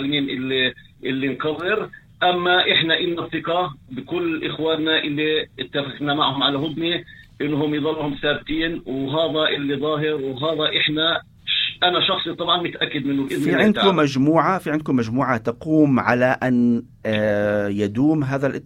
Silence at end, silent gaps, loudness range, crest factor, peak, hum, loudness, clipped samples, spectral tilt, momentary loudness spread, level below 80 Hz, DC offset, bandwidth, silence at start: 0.05 s; none; 4 LU; 20 dB; 0 dBFS; none; -20 LUFS; under 0.1%; -6 dB/octave; 8 LU; -52 dBFS; under 0.1%; 16.5 kHz; 0 s